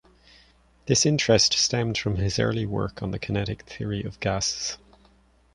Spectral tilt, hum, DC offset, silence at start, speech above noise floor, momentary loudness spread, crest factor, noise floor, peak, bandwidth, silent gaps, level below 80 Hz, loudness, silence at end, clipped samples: -3.5 dB/octave; none; under 0.1%; 0.85 s; 34 dB; 13 LU; 20 dB; -59 dBFS; -6 dBFS; 11 kHz; none; -46 dBFS; -24 LUFS; 0.8 s; under 0.1%